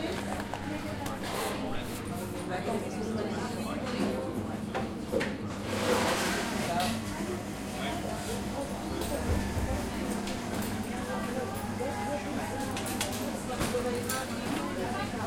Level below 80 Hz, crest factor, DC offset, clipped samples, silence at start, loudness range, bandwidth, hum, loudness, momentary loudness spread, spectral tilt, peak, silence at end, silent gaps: -48 dBFS; 20 dB; under 0.1%; under 0.1%; 0 s; 3 LU; 16.5 kHz; none; -33 LUFS; 5 LU; -4.5 dB/octave; -14 dBFS; 0 s; none